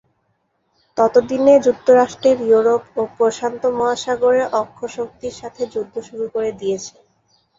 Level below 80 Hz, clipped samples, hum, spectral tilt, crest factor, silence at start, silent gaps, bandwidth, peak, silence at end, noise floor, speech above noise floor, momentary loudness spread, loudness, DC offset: -58 dBFS; under 0.1%; none; -4.5 dB/octave; 16 dB; 0.95 s; none; 7.8 kHz; -2 dBFS; 0.7 s; -67 dBFS; 50 dB; 14 LU; -17 LUFS; under 0.1%